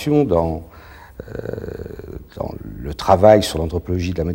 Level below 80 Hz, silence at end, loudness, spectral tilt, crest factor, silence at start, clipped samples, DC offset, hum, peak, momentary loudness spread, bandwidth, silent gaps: -36 dBFS; 0 s; -18 LUFS; -6.5 dB/octave; 20 dB; 0 s; under 0.1%; under 0.1%; none; 0 dBFS; 21 LU; 16.5 kHz; none